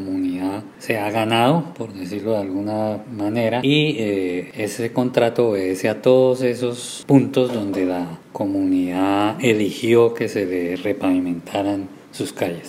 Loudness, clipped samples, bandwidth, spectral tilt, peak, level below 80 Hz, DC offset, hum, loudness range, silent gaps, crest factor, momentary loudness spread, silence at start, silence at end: -20 LUFS; under 0.1%; 16 kHz; -6 dB/octave; 0 dBFS; -64 dBFS; under 0.1%; none; 3 LU; none; 20 dB; 11 LU; 0 s; 0 s